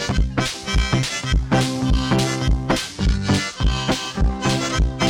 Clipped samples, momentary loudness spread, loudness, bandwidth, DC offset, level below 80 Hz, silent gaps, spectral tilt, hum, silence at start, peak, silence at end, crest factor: under 0.1%; 3 LU; -21 LUFS; 15.5 kHz; under 0.1%; -24 dBFS; none; -4.5 dB/octave; none; 0 s; -6 dBFS; 0 s; 14 dB